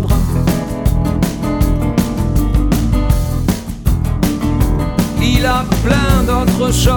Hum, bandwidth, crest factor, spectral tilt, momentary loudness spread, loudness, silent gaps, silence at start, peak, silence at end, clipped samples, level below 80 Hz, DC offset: none; 19.5 kHz; 12 dB; -6 dB/octave; 4 LU; -15 LUFS; none; 0 s; 0 dBFS; 0 s; under 0.1%; -18 dBFS; under 0.1%